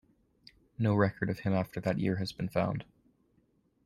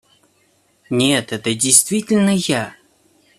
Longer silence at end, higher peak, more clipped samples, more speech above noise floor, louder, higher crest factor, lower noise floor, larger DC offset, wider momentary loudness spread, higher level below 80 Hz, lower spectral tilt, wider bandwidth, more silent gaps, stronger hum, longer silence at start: first, 1 s vs 0.65 s; second, -12 dBFS vs 0 dBFS; neither; about the same, 40 dB vs 43 dB; second, -32 LUFS vs -16 LUFS; about the same, 20 dB vs 20 dB; first, -71 dBFS vs -59 dBFS; neither; second, 7 LU vs 11 LU; about the same, -62 dBFS vs -58 dBFS; first, -8 dB/octave vs -3 dB/octave; about the same, 13.5 kHz vs 14.5 kHz; neither; neither; about the same, 0.8 s vs 0.9 s